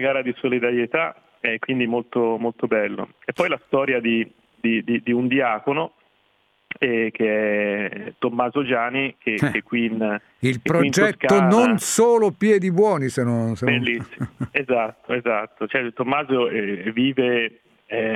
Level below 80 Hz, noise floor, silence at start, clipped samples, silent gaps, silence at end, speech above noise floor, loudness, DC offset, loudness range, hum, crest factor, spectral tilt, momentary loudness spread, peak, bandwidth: -62 dBFS; -64 dBFS; 0 s; under 0.1%; none; 0 s; 43 dB; -21 LUFS; under 0.1%; 5 LU; none; 18 dB; -5 dB/octave; 9 LU; -4 dBFS; 14.5 kHz